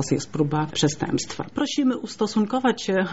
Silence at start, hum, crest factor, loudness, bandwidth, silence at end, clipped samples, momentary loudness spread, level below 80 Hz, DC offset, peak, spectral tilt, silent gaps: 0 s; none; 16 dB; -24 LUFS; 8 kHz; 0 s; under 0.1%; 5 LU; -56 dBFS; 0.4%; -8 dBFS; -5 dB/octave; none